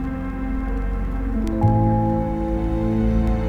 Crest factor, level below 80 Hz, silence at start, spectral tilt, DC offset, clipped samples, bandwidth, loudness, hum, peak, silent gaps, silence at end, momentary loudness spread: 14 dB; -26 dBFS; 0 s; -10 dB/octave; under 0.1%; under 0.1%; 6.2 kHz; -22 LUFS; none; -6 dBFS; none; 0 s; 8 LU